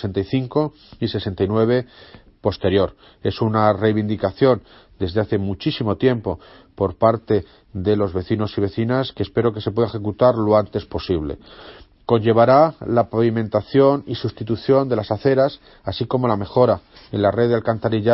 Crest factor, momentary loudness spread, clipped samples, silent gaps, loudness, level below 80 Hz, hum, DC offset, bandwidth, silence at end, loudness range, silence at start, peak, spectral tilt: 18 dB; 10 LU; under 0.1%; none; -20 LUFS; -46 dBFS; none; under 0.1%; 5.8 kHz; 0 s; 4 LU; 0 s; 0 dBFS; -11.5 dB/octave